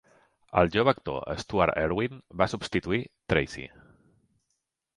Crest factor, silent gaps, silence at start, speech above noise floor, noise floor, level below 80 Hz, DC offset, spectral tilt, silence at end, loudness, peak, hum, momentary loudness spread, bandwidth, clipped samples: 24 dB; none; 0.5 s; 53 dB; -80 dBFS; -48 dBFS; under 0.1%; -6 dB/octave; 1.3 s; -28 LUFS; -6 dBFS; none; 9 LU; 11.5 kHz; under 0.1%